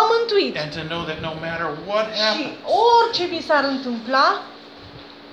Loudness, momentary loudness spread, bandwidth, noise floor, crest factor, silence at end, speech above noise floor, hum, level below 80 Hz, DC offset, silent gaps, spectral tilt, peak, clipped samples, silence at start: -20 LUFS; 23 LU; 9 kHz; -41 dBFS; 18 dB; 0 s; 20 dB; none; -56 dBFS; under 0.1%; none; -4.5 dB/octave; -4 dBFS; under 0.1%; 0 s